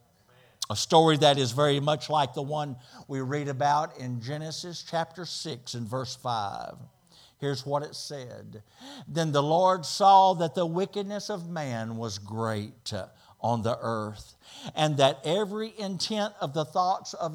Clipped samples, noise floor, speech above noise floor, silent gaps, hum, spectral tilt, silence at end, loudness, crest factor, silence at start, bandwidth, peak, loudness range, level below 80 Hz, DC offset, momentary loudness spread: under 0.1%; -60 dBFS; 33 dB; none; none; -5 dB/octave; 0 s; -27 LUFS; 22 dB; 0.6 s; 17 kHz; -6 dBFS; 9 LU; -70 dBFS; under 0.1%; 16 LU